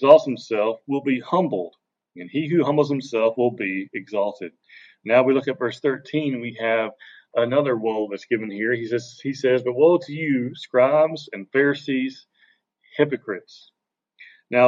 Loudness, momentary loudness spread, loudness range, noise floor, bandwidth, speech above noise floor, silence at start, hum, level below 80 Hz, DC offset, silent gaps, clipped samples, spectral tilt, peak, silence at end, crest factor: -22 LUFS; 12 LU; 3 LU; -62 dBFS; 7.6 kHz; 41 dB; 0 s; none; -78 dBFS; under 0.1%; none; under 0.1%; -7 dB/octave; -2 dBFS; 0 s; 20 dB